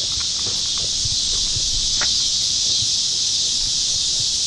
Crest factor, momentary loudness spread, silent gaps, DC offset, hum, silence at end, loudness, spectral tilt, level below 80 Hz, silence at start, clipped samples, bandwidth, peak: 14 dB; 3 LU; none; under 0.1%; none; 0 s; -17 LUFS; 0.5 dB/octave; -38 dBFS; 0 s; under 0.1%; 12.5 kHz; -6 dBFS